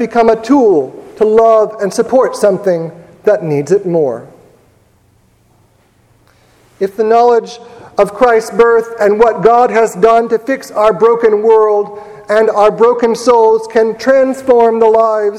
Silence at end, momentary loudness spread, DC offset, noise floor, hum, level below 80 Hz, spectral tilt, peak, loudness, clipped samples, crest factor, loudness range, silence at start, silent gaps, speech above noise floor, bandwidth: 0 s; 9 LU; under 0.1%; -51 dBFS; none; -48 dBFS; -5.5 dB/octave; 0 dBFS; -10 LUFS; 0.4%; 10 dB; 7 LU; 0 s; none; 41 dB; 13 kHz